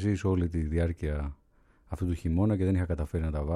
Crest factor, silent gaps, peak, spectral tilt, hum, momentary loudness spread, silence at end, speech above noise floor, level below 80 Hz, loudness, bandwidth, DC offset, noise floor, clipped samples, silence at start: 14 dB; none; -14 dBFS; -8.5 dB/octave; none; 9 LU; 0 s; 34 dB; -38 dBFS; -30 LUFS; 11 kHz; under 0.1%; -62 dBFS; under 0.1%; 0 s